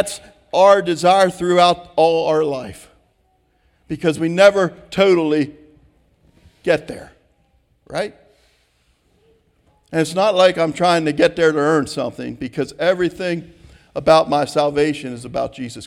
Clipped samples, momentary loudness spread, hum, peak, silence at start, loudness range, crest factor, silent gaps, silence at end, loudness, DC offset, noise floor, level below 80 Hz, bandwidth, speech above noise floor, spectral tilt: under 0.1%; 15 LU; none; 0 dBFS; 0 s; 11 LU; 18 dB; none; 0 s; -17 LUFS; under 0.1%; -62 dBFS; -52 dBFS; 13.5 kHz; 45 dB; -5 dB/octave